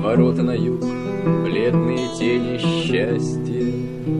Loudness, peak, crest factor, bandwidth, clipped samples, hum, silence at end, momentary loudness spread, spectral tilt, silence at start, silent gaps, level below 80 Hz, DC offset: -20 LUFS; -4 dBFS; 16 dB; 10.5 kHz; under 0.1%; none; 0 s; 6 LU; -7 dB/octave; 0 s; none; -48 dBFS; 0.4%